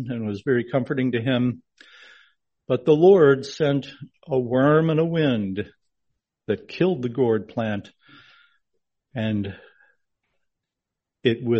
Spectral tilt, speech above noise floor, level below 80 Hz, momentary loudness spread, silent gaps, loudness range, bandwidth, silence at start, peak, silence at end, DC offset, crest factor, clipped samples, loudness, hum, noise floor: -8 dB/octave; 64 dB; -62 dBFS; 13 LU; none; 12 LU; 7.4 kHz; 0 s; -4 dBFS; 0 s; under 0.1%; 18 dB; under 0.1%; -22 LUFS; none; -85 dBFS